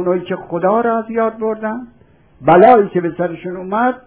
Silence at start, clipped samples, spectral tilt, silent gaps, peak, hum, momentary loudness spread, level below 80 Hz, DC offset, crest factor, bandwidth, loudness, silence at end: 0 s; 0.2%; -11 dB/octave; none; 0 dBFS; none; 14 LU; -54 dBFS; under 0.1%; 14 dB; 4 kHz; -15 LUFS; 0.1 s